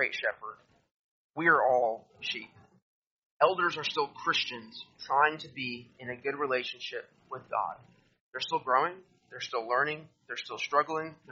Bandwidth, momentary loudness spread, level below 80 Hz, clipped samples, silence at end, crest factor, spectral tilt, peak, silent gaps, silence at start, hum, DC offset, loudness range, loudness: 7.4 kHz; 18 LU; -78 dBFS; under 0.1%; 0 s; 24 dB; -0.5 dB/octave; -8 dBFS; 0.91-1.30 s, 2.82-3.40 s, 8.20-8.32 s; 0 s; none; under 0.1%; 4 LU; -31 LUFS